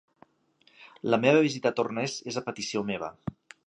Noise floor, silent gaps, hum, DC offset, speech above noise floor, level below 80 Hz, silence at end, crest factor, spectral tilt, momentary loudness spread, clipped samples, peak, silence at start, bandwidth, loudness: -65 dBFS; none; none; under 0.1%; 38 dB; -66 dBFS; 0.35 s; 22 dB; -5 dB/octave; 15 LU; under 0.1%; -8 dBFS; 0.8 s; 10.5 kHz; -28 LUFS